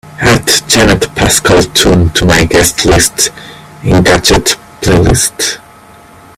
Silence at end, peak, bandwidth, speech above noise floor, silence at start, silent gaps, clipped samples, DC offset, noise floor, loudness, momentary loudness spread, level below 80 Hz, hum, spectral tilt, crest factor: 0.8 s; 0 dBFS; over 20 kHz; 28 dB; 0.05 s; none; 0.3%; under 0.1%; -36 dBFS; -8 LUFS; 6 LU; -24 dBFS; none; -3.5 dB/octave; 10 dB